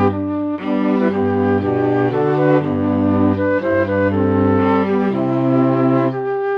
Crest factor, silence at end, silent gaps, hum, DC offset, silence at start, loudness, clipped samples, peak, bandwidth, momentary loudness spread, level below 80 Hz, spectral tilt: 12 dB; 0 s; none; none; under 0.1%; 0 s; -16 LUFS; under 0.1%; -2 dBFS; 5.6 kHz; 4 LU; -56 dBFS; -10 dB/octave